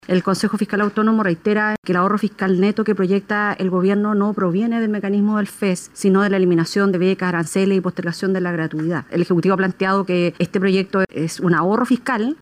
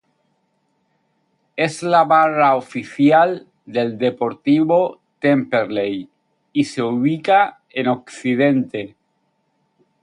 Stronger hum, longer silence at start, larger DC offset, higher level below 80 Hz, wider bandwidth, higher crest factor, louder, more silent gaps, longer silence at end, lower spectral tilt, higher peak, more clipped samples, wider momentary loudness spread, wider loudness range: neither; second, 0.1 s vs 1.55 s; neither; first, -60 dBFS vs -66 dBFS; first, 14.5 kHz vs 11 kHz; about the same, 14 dB vs 16 dB; about the same, -19 LUFS vs -18 LUFS; first, 1.78-1.83 s vs none; second, 0.05 s vs 1.15 s; about the same, -6.5 dB/octave vs -6.5 dB/octave; about the same, -4 dBFS vs -2 dBFS; neither; second, 5 LU vs 12 LU; about the same, 1 LU vs 3 LU